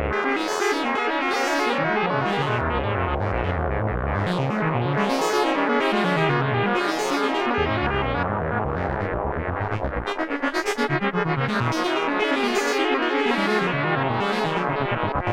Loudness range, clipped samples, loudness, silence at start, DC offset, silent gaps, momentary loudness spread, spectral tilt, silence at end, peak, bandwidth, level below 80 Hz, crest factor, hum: 3 LU; under 0.1%; -23 LUFS; 0 s; under 0.1%; none; 4 LU; -5.5 dB/octave; 0 s; -8 dBFS; 16.5 kHz; -38 dBFS; 14 dB; none